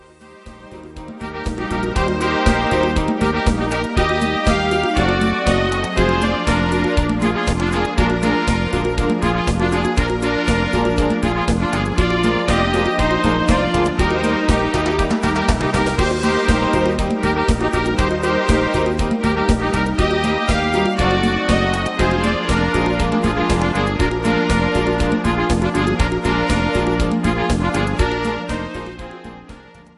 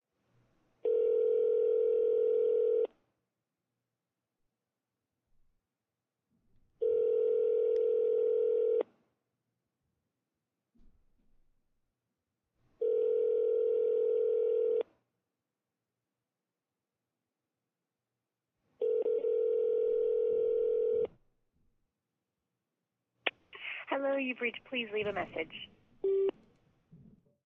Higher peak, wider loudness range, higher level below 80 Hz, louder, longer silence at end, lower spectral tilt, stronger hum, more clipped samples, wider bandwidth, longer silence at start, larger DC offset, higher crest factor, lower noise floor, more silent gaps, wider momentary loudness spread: first, -2 dBFS vs -12 dBFS; second, 1 LU vs 9 LU; first, -26 dBFS vs -76 dBFS; first, -18 LUFS vs -31 LUFS; second, 0.35 s vs 0.5 s; first, -5.5 dB/octave vs -2 dB/octave; neither; neither; first, 11.5 kHz vs 3.7 kHz; second, 0.2 s vs 0.85 s; neither; second, 16 dB vs 22 dB; second, -41 dBFS vs under -90 dBFS; neither; second, 3 LU vs 9 LU